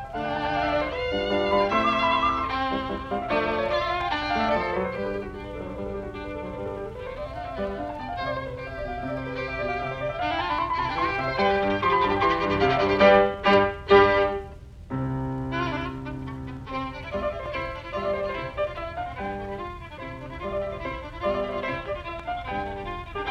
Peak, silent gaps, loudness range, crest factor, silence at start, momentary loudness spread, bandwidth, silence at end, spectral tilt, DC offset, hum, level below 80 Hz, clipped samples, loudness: -4 dBFS; none; 11 LU; 22 dB; 0 s; 14 LU; 9 kHz; 0 s; -6.5 dB/octave; under 0.1%; none; -44 dBFS; under 0.1%; -26 LUFS